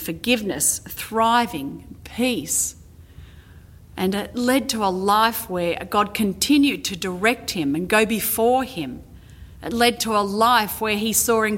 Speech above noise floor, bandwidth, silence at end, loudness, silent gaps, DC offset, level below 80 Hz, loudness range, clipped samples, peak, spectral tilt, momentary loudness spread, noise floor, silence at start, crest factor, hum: 24 dB; 17 kHz; 0 s; -21 LUFS; none; under 0.1%; -48 dBFS; 4 LU; under 0.1%; -2 dBFS; -3 dB/octave; 11 LU; -45 dBFS; 0 s; 20 dB; none